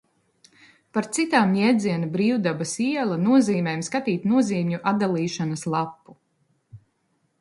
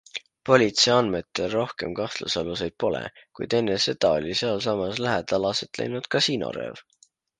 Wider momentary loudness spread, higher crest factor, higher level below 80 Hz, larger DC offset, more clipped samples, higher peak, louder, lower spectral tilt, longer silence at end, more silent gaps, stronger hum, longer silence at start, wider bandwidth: second, 7 LU vs 12 LU; about the same, 20 dB vs 24 dB; second, -68 dBFS vs -56 dBFS; neither; neither; about the same, -4 dBFS vs -2 dBFS; about the same, -23 LUFS vs -24 LUFS; first, -5.5 dB/octave vs -4 dB/octave; about the same, 0.65 s vs 0.6 s; neither; neither; first, 0.95 s vs 0.15 s; first, 11.5 kHz vs 10 kHz